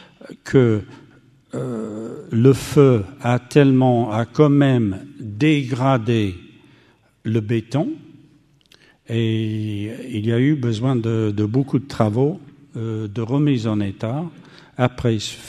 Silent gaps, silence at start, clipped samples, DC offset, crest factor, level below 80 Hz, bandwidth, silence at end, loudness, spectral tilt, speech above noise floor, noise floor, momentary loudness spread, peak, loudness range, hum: none; 0.3 s; under 0.1%; under 0.1%; 20 dB; -52 dBFS; 13.5 kHz; 0 s; -19 LUFS; -7.5 dB/octave; 37 dB; -55 dBFS; 15 LU; 0 dBFS; 8 LU; none